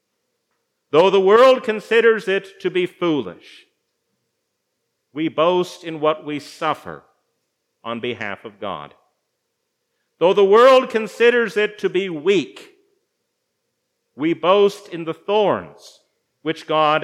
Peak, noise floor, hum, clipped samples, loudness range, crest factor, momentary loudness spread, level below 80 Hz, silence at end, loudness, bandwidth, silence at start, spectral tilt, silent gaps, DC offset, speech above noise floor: -2 dBFS; -74 dBFS; none; under 0.1%; 10 LU; 18 dB; 18 LU; -76 dBFS; 0 s; -18 LUFS; 13 kHz; 0.95 s; -5 dB/octave; none; under 0.1%; 57 dB